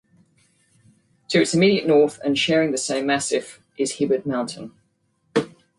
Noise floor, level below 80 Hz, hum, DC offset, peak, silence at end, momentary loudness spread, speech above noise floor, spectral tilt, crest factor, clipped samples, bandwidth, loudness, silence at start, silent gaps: -67 dBFS; -64 dBFS; none; under 0.1%; -6 dBFS; 0.3 s; 10 LU; 47 dB; -4 dB/octave; 18 dB; under 0.1%; 11.5 kHz; -21 LUFS; 1.3 s; none